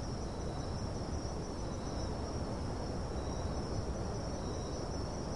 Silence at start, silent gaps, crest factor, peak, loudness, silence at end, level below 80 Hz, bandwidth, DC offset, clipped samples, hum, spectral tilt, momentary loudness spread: 0 s; none; 12 dB; -26 dBFS; -40 LUFS; 0 s; -44 dBFS; 11.5 kHz; 0.2%; under 0.1%; none; -6 dB/octave; 2 LU